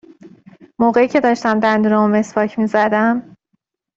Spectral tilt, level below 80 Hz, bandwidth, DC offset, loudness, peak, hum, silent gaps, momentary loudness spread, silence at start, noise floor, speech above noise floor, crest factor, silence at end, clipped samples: -6.5 dB/octave; -58 dBFS; 7.6 kHz; under 0.1%; -15 LUFS; -2 dBFS; none; none; 4 LU; 0.25 s; -69 dBFS; 54 dB; 14 dB; 0.75 s; under 0.1%